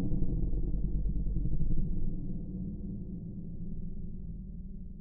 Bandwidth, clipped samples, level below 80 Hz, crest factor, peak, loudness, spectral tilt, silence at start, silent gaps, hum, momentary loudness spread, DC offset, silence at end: 0.9 kHz; under 0.1%; -34 dBFS; 14 dB; -16 dBFS; -38 LUFS; -18 dB/octave; 0 s; none; none; 9 LU; under 0.1%; 0 s